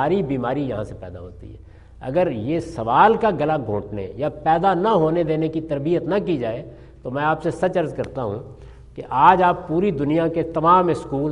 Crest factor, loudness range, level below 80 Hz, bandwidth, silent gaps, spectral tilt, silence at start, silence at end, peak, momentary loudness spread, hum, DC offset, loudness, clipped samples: 20 dB; 4 LU; -46 dBFS; 11 kHz; none; -8 dB/octave; 0 s; 0 s; 0 dBFS; 17 LU; none; under 0.1%; -20 LUFS; under 0.1%